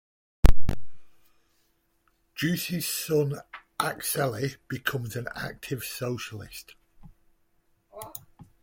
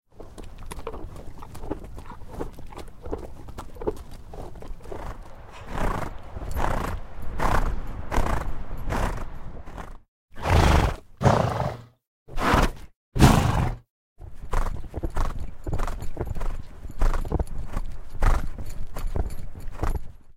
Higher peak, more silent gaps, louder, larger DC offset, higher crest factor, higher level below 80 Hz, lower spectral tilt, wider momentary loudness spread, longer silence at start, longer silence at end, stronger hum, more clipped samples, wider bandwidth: second, -4 dBFS vs 0 dBFS; second, none vs 10.08-10.28 s, 12.07-12.26 s, 12.96-13.12 s, 13.90-14.16 s; about the same, -30 LUFS vs -28 LUFS; neither; about the same, 22 dB vs 26 dB; about the same, -34 dBFS vs -30 dBFS; second, -4.5 dB/octave vs -6 dB/octave; second, 17 LU vs 21 LU; first, 0.45 s vs 0.2 s; first, 0.55 s vs 0.05 s; neither; neither; about the same, 17 kHz vs 16 kHz